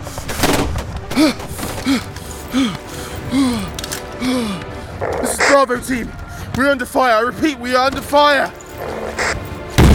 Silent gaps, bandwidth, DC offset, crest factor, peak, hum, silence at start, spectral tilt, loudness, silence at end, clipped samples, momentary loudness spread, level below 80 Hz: none; 18 kHz; under 0.1%; 16 dB; 0 dBFS; none; 0 s; -4.5 dB/octave; -18 LUFS; 0 s; under 0.1%; 14 LU; -28 dBFS